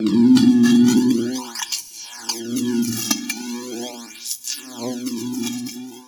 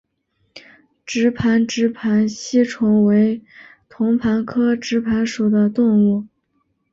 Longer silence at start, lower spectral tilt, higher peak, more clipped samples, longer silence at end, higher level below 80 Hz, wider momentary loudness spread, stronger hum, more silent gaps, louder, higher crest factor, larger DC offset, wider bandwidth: second, 0 s vs 0.55 s; second, -4 dB/octave vs -6 dB/octave; about the same, -2 dBFS vs -4 dBFS; neither; second, 0.05 s vs 0.65 s; second, -60 dBFS vs -52 dBFS; first, 16 LU vs 5 LU; neither; neither; about the same, -20 LUFS vs -18 LUFS; about the same, 18 dB vs 14 dB; neither; first, 19.5 kHz vs 7.6 kHz